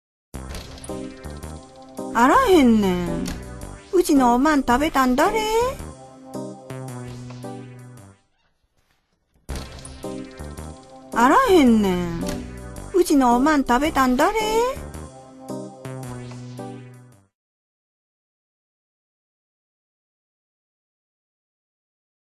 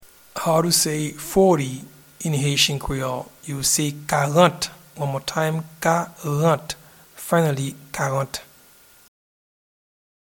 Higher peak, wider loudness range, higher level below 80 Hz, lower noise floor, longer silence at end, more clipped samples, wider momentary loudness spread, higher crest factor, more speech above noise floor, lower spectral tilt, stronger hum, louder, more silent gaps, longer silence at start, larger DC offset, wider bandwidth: about the same, -4 dBFS vs -2 dBFS; first, 20 LU vs 6 LU; first, -42 dBFS vs -48 dBFS; first, -67 dBFS vs -51 dBFS; first, 5.35 s vs 1.95 s; neither; first, 22 LU vs 13 LU; about the same, 18 dB vs 22 dB; first, 49 dB vs 30 dB; about the same, -5 dB/octave vs -4 dB/octave; neither; first, -18 LUFS vs -21 LUFS; neither; about the same, 0.35 s vs 0.35 s; neither; second, 13.5 kHz vs 19 kHz